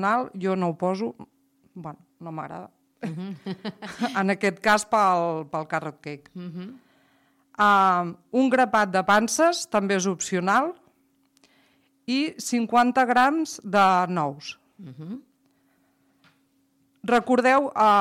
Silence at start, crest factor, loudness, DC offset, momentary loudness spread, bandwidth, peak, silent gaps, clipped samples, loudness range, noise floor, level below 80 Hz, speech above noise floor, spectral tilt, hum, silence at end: 0 s; 16 dB; -23 LUFS; under 0.1%; 20 LU; 16 kHz; -10 dBFS; none; under 0.1%; 10 LU; -67 dBFS; -66 dBFS; 43 dB; -4.5 dB/octave; none; 0 s